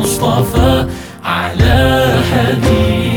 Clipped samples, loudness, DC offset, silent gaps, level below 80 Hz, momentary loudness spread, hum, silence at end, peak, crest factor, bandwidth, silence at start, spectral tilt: under 0.1%; -12 LUFS; under 0.1%; none; -22 dBFS; 7 LU; none; 0 s; 0 dBFS; 12 dB; 19 kHz; 0 s; -5.5 dB/octave